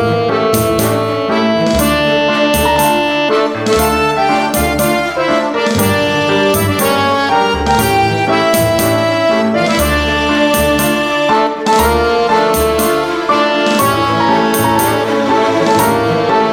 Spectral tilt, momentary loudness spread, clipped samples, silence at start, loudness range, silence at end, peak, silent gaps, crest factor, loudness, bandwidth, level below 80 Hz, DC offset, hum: -4.5 dB/octave; 2 LU; under 0.1%; 0 s; 1 LU; 0 s; 0 dBFS; none; 12 dB; -12 LUFS; over 20 kHz; -30 dBFS; under 0.1%; none